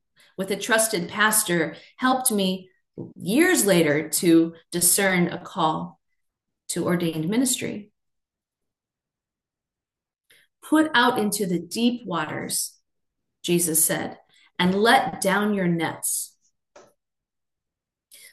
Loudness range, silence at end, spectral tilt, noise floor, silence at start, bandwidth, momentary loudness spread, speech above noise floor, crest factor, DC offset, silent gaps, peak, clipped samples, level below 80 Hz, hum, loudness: 8 LU; 0.05 s; -3.5 dB/octave; -90 dBFS; 0.4 s; 13 kHz; 14 LU; 67 dB; 20 dB; under 0.1%; none; -4 dBFS; under 0.1%; -66 dBFS; none; -22 LUFS